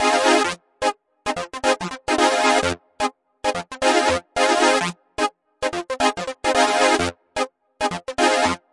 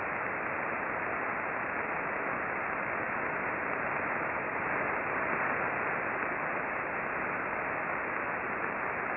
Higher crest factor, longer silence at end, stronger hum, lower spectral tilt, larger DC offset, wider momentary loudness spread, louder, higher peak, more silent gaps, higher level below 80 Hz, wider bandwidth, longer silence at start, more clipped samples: about the same, 20 dB vs 18 dB; first, 0.15 s vs 0 s; neither; second, -2.5 dB/octave vs -9.5 dB/octave; neither; first, 10 LU vs 2 LU; first, -21 LUFS vs -32 LUFS; first, -2 dBFS vs -16 dBFS; neither; first, -52 dBFS vs -64 dBFS; first, 11.5 kHz vs 4.1 kHz; about the same, 0 s vs 0 s; neither